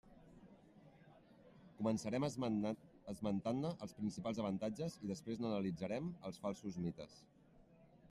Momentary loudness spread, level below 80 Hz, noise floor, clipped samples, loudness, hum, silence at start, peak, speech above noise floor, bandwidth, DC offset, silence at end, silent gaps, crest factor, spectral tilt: 17 LU; -74 dBFS; -66 dBFS; under 0.1%; -43 LUFS; none; 0.05 s; -24 dBFS; 24 dB; 12.5 kHz; under 0.1%; 0.05 s; none; 20 dB; -6.5 dB/octave